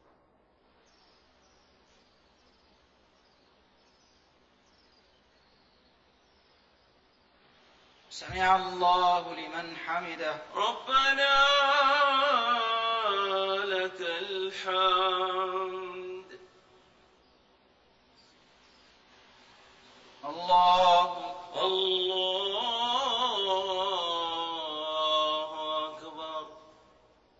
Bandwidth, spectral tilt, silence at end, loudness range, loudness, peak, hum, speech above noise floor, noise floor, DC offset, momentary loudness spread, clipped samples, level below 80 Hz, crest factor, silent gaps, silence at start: 8 kHz; -2.5 dB/octave; 0.8 s; 9 LU; -27 LUFS; -12 dBFS; none; 39 dB; -66 dBFS; under 0.1%; 16 LU; under 0.1%; -64 dBFS; 20 dB; none; 8.1 s